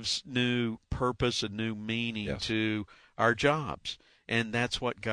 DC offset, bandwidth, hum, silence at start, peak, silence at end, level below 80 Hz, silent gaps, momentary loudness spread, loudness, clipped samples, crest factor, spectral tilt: under 0.1%; 10.5 kHz; none; 0 s; -12 dBFS; 0 s; -50 dBFS; none; 9 LU; -31 LUFS; under 0.1%; 20 dB; -4.5 dB/octave